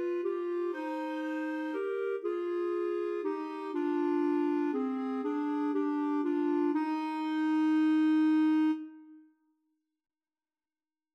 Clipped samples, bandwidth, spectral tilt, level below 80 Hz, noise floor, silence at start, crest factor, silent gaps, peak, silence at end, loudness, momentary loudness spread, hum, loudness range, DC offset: under 0.1%; 6 kHz; -5 dB/octave; under -90 dBFS; under -90 dBFS; 0 s; 10 dB; none; -20 dBFS; 1.95 s; -31 LUFS; 8 LU; none; 5 LU; under 0.1%